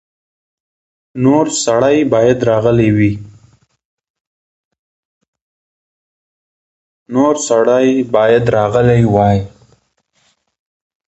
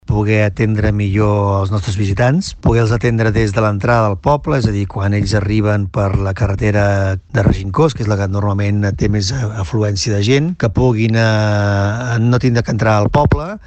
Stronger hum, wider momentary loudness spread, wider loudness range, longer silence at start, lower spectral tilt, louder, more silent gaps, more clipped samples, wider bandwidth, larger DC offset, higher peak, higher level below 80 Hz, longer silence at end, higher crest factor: neither; about the same, 6 LU vs 4 LU; first, 8 LU vs 2 LU; first, 1.15 s vs 0.1 s; about the same, -6 dB/octave vs -6.5 dB/octave; first, -12 LUFS vs -15 LUFS; first, 3.85-3.98 s, 4.10-4.14 s, 4.21-4.71 s, 4.79-5.21 s, 5.28-5.33 s, 5.42-7.06 s vs none; neither; about the same, 8.2 kHz vs 8.6 kHz; neither; about the same, 0 dBFS vs -2 dBFS; second, -42 dBFS vs -30 dBFS; first, 1.6 s vs 0.1 s; about the same, 14 dB vs 12 dB